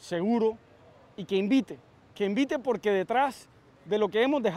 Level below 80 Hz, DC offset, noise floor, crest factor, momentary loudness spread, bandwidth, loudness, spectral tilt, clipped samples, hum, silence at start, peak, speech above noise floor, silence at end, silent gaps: -70 dBFS; under 0.1%; -56 dBFS; 16 dB; 19 LU; 12.5 kHz; -28 LUFS; -6 dB/octave; under 0.1%; none; 0.05 s; -12 dBFS; 29 dB; 0 s; none